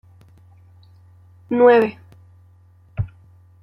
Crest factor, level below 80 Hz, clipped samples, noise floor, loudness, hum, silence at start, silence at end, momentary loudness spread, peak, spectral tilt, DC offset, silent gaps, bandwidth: 20 dB; -50 dBFS; under 0.1%; -51 dBFS; -18 LUFS; none; 1.5 s; 0.55 s; 18 LU; -2 dBFS; -8.5 dB/octave; under 0.1%; none; 5.6 kHz